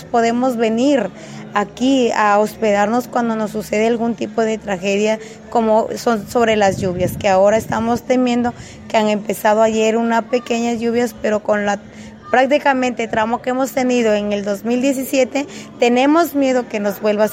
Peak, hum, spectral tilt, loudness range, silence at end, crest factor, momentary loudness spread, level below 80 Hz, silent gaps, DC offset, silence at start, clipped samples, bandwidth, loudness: -2 dBFS; none; -5 dB/octave; 2 LU; 0 s; 16 dB; 7 LU; -50 dBFS; none; under 0.1%; 0 s; under 0.1%; 16.5 kHz; -17 LUFS